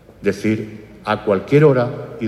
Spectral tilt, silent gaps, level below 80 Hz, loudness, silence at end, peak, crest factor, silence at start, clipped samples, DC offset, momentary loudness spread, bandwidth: -8 dB/octave; none; -52 dBFS; -17 LUFS; 0 s; -2 dBFS; 16 dB; 0.2 s; under 0.1%; under 0.1%; 12 LU; 12 kHz